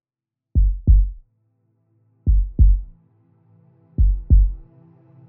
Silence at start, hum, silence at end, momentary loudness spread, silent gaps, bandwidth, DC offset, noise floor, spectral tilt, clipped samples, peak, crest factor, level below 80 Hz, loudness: 0.55 s; none; 0.7 s; 10 LU; none; 0.7 kHz; under 0.1%; -86 dBFS; -17.5 dB/octave; under 0.1%; -4 dBFS; 16 dB; -20 dBFS; -20 LUFS